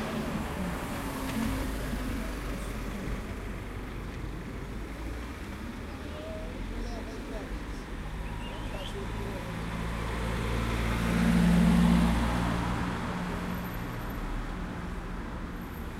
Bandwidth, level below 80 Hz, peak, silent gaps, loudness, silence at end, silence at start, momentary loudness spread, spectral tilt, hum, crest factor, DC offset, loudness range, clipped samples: 16 kHz; -38 dBFS; -12 dBFS; none; -33 LUFS; 0 s; 0 s; 14 LU; -6 dB/octave; none; 20 dB; under 0.1%; 12 LU; under 0.1%